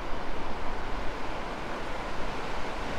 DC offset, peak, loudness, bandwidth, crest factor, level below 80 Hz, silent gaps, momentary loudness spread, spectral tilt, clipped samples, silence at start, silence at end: under 0.1%; -16 dBFS; -36 LUFS; 9.2 kHz; 12 dB; -38 dBFS; none; 1 LU; -5 dB/octave; under 0.1%; 0 s; 0 s